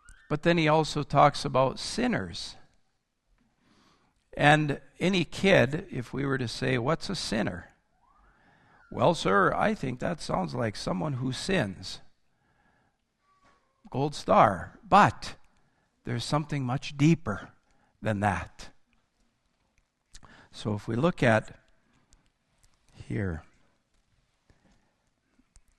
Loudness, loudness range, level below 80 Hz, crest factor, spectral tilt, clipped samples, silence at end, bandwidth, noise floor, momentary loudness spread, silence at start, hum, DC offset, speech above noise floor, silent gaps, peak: -27 LUFS; 9 LU; -52 dBFS; 26 dB; -5.5 dB/octave; under 0.1%; 2.35 s; 12.5 kHz; -73 dBFS; 16 LU; 0.1 s; none; under 0.1%; 47 dB; none; -4 dBFS